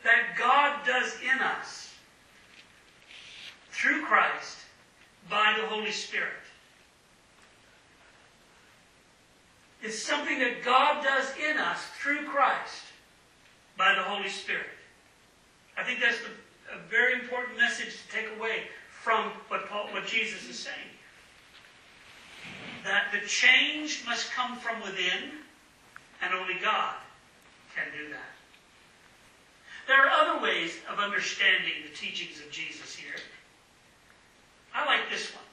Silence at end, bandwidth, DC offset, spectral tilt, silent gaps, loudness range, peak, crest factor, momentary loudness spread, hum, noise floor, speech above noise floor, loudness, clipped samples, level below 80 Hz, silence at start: 0.1 s; 12.5 kHz; under 0.1%; -1 dB/octave; none; 8 LU; -6 dBFS; 26 dB; 20 LU; none; -61 dBFS; 32 dB; -27 LUFS; under 0.1%; -74 dBFS; 0 s